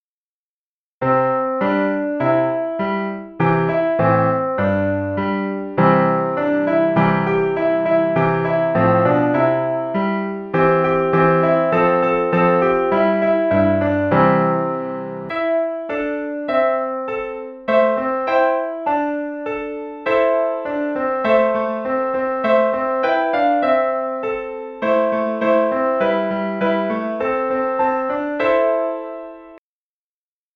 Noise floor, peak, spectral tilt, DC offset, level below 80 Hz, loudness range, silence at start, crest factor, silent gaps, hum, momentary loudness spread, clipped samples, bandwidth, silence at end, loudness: under -90 dBFS; -2 dBFS; -9.5 dB/octave; under 0.1%; -52 dBFS; 4 LU; 1 s; 16 dB; none; none; 8 LU; under 0.1%; 6 kHz; 0.95 s; -18 LUFS